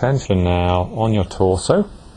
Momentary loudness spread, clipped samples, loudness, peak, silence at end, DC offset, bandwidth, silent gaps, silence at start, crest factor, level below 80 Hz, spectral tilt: 2 LU; under 0.1%; -18 LUFS; 0 dBFS; 0.05 s; under 0.1%; 10 kHz; none; 0 s; 16 dB; -36 dBFS; -6.5 dB/octave